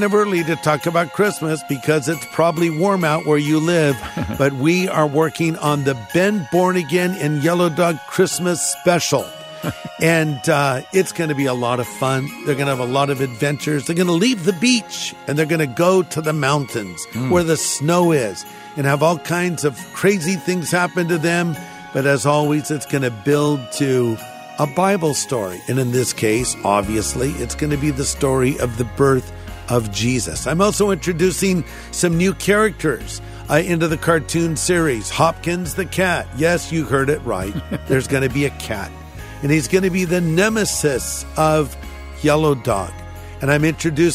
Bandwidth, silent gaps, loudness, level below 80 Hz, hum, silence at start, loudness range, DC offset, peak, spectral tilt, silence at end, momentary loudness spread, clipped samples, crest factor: 16 kHz; none; -18 LUFS; -40 dBFS; none; 0 s; 2 LU; under 0.1%; 0 dBFS; -5 dB/octave; 0 s; 8 LU; under 0.1%; 18 dB